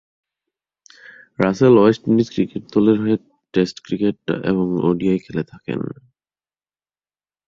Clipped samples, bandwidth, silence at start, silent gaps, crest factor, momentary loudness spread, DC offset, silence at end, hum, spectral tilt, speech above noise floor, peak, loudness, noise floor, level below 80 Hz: under 0.1%; 7.4 kHz; 1.4 s; none; 20 dB; 14 LU; under 0.1%; 1.55 s; none; -8 dB/octave; over 72 dB; 0 dBFS; -19 LUFS; under -90 dBFS; -54 dBFS